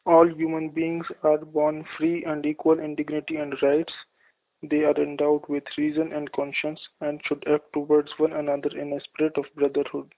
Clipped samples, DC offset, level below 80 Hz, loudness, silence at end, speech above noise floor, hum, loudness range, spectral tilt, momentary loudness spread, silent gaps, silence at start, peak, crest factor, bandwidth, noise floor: under 0.1%; under 0.1%; -66 dBFS; -25 LUFS; 0.15 s; 42 dB; none; 2 LU; -10 dB/octave; 8 LU; none; 0.05 s; -4 dBFS; 20 dB; 4 kHz; -66 dBFS